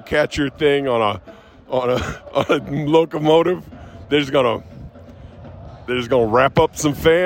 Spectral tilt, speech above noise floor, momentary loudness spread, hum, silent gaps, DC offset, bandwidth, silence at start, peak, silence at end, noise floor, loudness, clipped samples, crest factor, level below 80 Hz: -5.5 dB/octave; 22 dB; 22 LU; none; none; under 0.1%; 16.5 kHz; 0.05 s; -4 dBFS; 0 s; -40 dBFS; -18 LUFS; under 0.1%; 16 dB; -44 dBFS